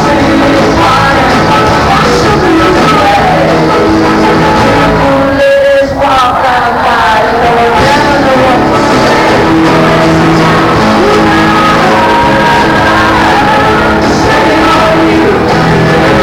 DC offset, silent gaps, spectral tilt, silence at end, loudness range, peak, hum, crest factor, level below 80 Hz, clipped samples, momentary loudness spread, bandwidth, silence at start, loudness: under 0.1%; none; -5.5 dB/octave; 0 s; 1 LU; -2 dBFS; none; 4 dB; -24 dBFS; under 0.1%; 1 LU; 18.5 kHz; 0 s; -6 LUFS